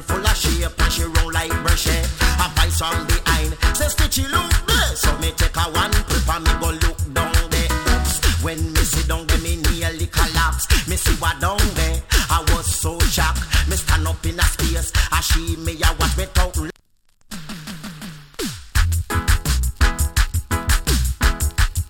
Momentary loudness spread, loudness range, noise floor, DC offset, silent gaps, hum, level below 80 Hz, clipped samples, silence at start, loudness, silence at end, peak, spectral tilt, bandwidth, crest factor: 5 LU; 4 LU; -56 dBFS; under 0.1%; none; none; -22 dBFS; under 0.1%; 0 s; -19 LUFS; 0 s; -2 dBFS; -3.5 dB/octave; 17.5 kHz; 16 dB